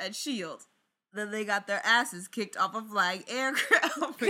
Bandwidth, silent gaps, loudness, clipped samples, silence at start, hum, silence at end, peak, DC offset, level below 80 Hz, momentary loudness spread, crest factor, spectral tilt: 17 kHz; none; -29 LUFS; under 0.1%; 0 s; none; 0 s; -8 dBFS; under 0.1%; -88 dBFS; 13 LU; 22 dB; -2 dB/octave